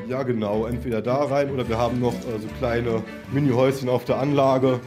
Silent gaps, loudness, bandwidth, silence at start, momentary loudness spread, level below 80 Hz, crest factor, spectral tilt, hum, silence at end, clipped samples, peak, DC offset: none; -23 LUFS; 15.5 kHz; 0 s; 8 LU; -46 dBFS; 16 dB; -7.5 dB/octave; none; 0 s; under 0.1%; -6 dBFS; under 0.1%